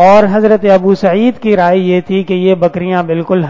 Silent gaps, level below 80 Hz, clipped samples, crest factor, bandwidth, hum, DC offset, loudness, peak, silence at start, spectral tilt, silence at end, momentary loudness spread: none; -46 dBFS; 0.6%; 10 dB; 7.6 kHz; none; under 0.1%; -10 LUFS; 0 dBFS; 0 s; -8 dB/octave; 0 s; 6 LU